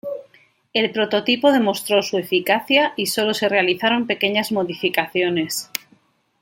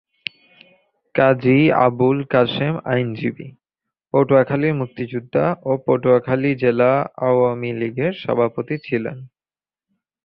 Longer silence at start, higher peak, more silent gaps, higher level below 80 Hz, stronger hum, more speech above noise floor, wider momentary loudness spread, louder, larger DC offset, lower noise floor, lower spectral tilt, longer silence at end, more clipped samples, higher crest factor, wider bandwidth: second, 0.05 s vs 1.15 s; about the same, 0 dBFS vs -2 dBFS; neither; second, -68 dBFS vs -58 dBFS; neither; second, 39 dB vs over 72 dB; second, 8 LU vs 11 LU; about the same, -19 LUFS vs -19 LUFS; neither; second, -58 dBFS vs under -90 dBFS; second, -3.5 dB/octave vs -10.5 dB/octave; second, 0.65 s vs 1 s; neither; about the same, 20 dB vs 18 dB; first, 17 kHz vs 5.4 kHz